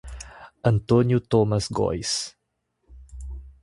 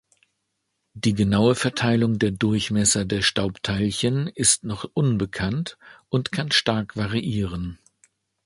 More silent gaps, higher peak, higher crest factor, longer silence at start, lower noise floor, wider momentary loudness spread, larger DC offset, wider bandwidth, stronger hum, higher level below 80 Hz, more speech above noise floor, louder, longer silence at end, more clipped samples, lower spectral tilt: neither; about the same, -6 dBFS vs -4 dBFS; about the same, 20 dB vs 20 dB; second, 0.05 s vs 0.95 s; about the same, -75 dBFS vs -76 dBFS; first, 20 LU vs 8 LU; neither; about the same, 11.5 kHz vs 11.5 kHz; neither; about the same, -42 dBFS vs -46 dBFS; about the same, 54 dB vs 54 dB; about the same, -23 LUFS vs -22 LUFS; second, 0.15 s vs 0.7 s; neither; first, -6 dB/octave vs -4 dB/octave